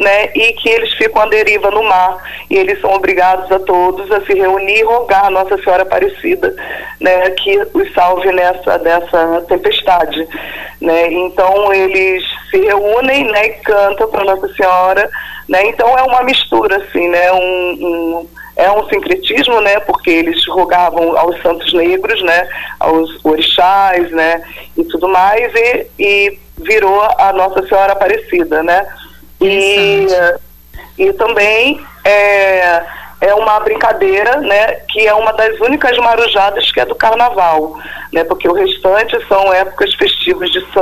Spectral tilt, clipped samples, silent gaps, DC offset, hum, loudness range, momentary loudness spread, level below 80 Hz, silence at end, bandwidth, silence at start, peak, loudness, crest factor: -3.5 dB/octave; under 0.1%; none; under 0.1%; none; 2 LU; 6 LU; -40 dBFS; 0 s; 15 kHz; 0 s; -2 dBFS; -11 LUFS; 10 dB